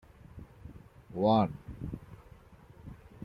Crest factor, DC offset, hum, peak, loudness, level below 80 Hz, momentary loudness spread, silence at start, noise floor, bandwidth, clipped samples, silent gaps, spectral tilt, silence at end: 22 dB; under 0.1%; none; -12 dBFS; -31 LUFS; -54 dBFS; 26 LU; 0.35 s; -55 dBFS; 5.8 kHz; under 0.1%; none; -9 dB/octave; 0 s